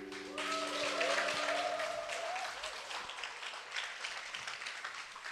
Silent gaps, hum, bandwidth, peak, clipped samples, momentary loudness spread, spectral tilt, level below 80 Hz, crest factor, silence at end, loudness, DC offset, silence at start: none; none; 13 kHz; -18 dBFS; under 0.1%; 10 LU; -0.5 dB/octave; -76 dBFS; 22 dB; 0 s; -38 LUFS; under 0.1%; 0 s